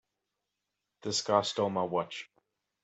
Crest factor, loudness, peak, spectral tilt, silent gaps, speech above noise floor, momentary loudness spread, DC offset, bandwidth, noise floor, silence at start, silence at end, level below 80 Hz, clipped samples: 24 dB; -31 LUFS; -10 dBFS; -3.5 dB/octave; none; 55 dB; 15 LU; under 0.1%; 8.2 kHz; -86 dBFS; 1.05 s; 0.6 s; -76 dBFS; under 0.1%